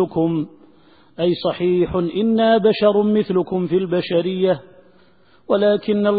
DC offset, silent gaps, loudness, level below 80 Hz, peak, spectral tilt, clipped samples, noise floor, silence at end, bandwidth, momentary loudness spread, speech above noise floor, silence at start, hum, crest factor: 0.2%; none; -18 LUFS; -52 dBFS; -4 dBFS; -12 dB/octave; under 0.1%; -55 dBFS; 0 s; 4.9 kHz; 6 LU; 37 dB; 0 s; none; 16 dB